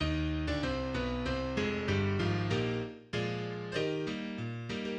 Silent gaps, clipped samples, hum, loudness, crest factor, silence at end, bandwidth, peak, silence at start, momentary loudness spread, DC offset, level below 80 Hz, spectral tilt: none; under 0.1%; none; -34 LUFS; 14 dB; 0 s; 9.4 kHz; -20 dBFS; 0 s; 7 LU; under 0.1%; -46 dBFS; -6.5 dB/octave